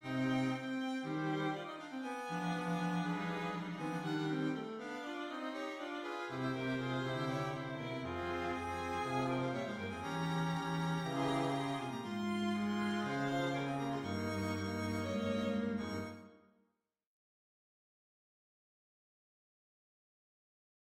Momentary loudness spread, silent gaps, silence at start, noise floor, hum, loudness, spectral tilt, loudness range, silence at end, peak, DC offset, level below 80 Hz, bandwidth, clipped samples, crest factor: 6 LU; none; 0 s; -82 dBFS; none; -39 LUFS; -6 dB/octave; 3 LU; 4.6 s; -24 dBFS; under 0.1%; -68 dBFS; 16 kHz; under 0.1%; 16 dB